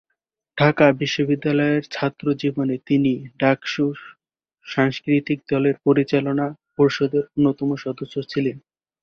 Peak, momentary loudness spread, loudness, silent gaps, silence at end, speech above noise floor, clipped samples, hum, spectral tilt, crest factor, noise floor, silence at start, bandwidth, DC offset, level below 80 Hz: -2 dBFS; 8 LU; -21 LUFS; none; 0.45 s; 58 dB; under 0.1%; none; -7 dB/octave; 18 dB; -78 dBFS; 0.55 s; 6.8 kHz; under 0.1%; -60 dBFS